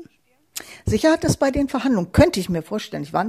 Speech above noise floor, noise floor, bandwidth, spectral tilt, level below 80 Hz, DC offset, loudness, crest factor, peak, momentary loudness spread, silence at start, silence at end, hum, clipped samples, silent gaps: 38 dB; -57 dBFS; 15 kHz; -5.5 dB/octave; -38 dBFS; under 0.1%; -20 LUFS; 18 dB; -2 dBFS; 15 LU; 0 s; 0 s; none; under 0.1%; none